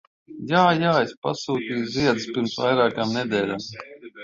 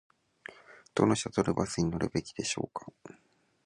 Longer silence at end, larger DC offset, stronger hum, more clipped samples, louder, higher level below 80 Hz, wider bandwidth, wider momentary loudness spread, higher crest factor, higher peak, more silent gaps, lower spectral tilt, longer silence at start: second, 0 s vs 0.55 s; neither; neither; neither; first, -22 LUFS vs -31 LUFS; about the same, -60 dBFS vs -56 dBFS; second, 7.8 kHz vs 11.5 kHz; second, 15 LU vs 21 LU; second, 18 dB vs 24 dB; first, -4 dBFS vs -10 dBFS; first, 1.17-1.22 s vs none; about the same, -5.5 dB/octave vs -5 dB/octave; second, 0.3 s vs 0.5 s